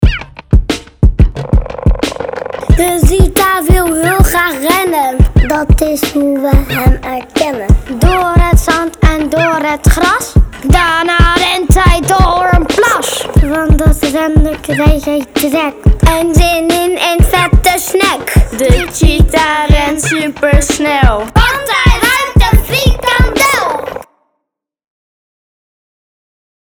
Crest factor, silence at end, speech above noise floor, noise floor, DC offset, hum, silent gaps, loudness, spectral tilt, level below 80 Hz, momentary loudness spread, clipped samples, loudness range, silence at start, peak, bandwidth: 10 dB; 2.7 s; 64 dB; -73 dBFS; 0.3%; none; none; -11 LUFS; -5 dB/octave; -14 dBFS; 5 LU; 0.8%; 2 LU; 0 s; 0 dBFS; over 20 kHz